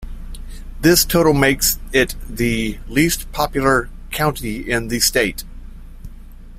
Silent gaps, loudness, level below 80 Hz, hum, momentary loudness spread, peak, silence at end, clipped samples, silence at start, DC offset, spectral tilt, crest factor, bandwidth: none; -17 LUFS; -30 dBFS; none; 21 LU; -2 dBFS; 0 s; under 0.1%; 0 s; under 0.1%; -3.5 dB/octave; 18 dB; 16 kHz